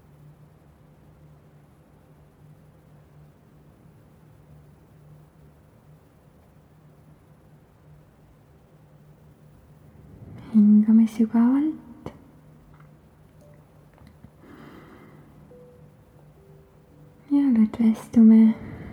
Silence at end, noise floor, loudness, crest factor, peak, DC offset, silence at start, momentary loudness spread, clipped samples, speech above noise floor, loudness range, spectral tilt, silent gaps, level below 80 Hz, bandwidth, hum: 0.05 s; -54 dBFS; -19 LUFS; 18 dB; -8 dBFS; under 0.1%; 10.5 s; 29 LU; under 0.1%; 38 dB; 11 LU; -9 dB/octave; none; -60 dBFS; 6.4 kHz; none